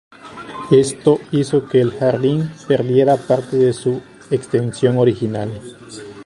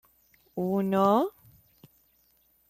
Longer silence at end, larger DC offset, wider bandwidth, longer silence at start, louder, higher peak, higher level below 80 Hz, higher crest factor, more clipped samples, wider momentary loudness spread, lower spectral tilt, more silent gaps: second, 0 s vs 1.4 s; neither; second, 11.5 kHz vs 15 kHz; second, 0.25 s vs 0.55 s; first, -17 LUFS vs -26 LUFS; first, 0 dBFS vs -12 dBFS; first, -52 dBFS vs -70 dBFS; about the same, 16 dB vs 18 dB; neither; first, 18 LU vs 11 LU; about the same, -7 dB/octave vs -8 dB/octave; neither